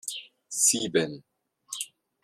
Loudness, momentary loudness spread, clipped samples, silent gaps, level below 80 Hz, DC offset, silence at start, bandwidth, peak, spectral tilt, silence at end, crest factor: -26 LUFS; 18 LU; under 0.1%; none; -72 dBFS; under 0.1%; 0.05 s; 15.5 kHz; -8 dBFS; -2 dB/octave; 0.35 s; 22 dB